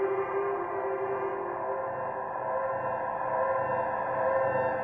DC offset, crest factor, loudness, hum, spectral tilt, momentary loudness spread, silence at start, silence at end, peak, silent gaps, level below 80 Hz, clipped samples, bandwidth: under 0.1%; 14 dB; -31 LUFS; none; -9 dB/octave; 6 LU; 0 s; 0 s; -16 dBFS; none; -64 dBFS; under 0.1%; 3.9 kHz